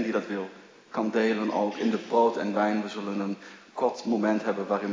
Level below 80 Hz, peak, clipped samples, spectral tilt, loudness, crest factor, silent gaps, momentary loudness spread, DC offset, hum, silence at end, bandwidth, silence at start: -82 dBFS; -10 dBFS; under 0.1%; -6 dB/octave; -28 LUFS; 18 dB; none; 10 LU; under 0.1%; none; 0 s; 7.6 kHz; 0 s